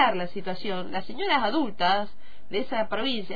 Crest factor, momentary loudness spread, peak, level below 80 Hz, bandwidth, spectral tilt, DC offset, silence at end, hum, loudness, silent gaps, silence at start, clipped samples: 20 dB; 9 LU; -6 dBFS; -58 dBFS; 5 kHz; -6 dB/octave; 4%; 0 s; none; -27 LUFS; none; 0 s; under 0.1%